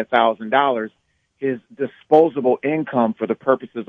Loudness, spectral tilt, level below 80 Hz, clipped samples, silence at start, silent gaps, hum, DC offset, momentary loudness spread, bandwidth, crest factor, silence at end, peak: -19 LUFS; -8 dB/octave; -70 dBFS; under 0.1%; 0 s; none; none; under 0.1%; 12 LU; 4.7 kHz; 18 dB; 0.05 s; -2 dBFS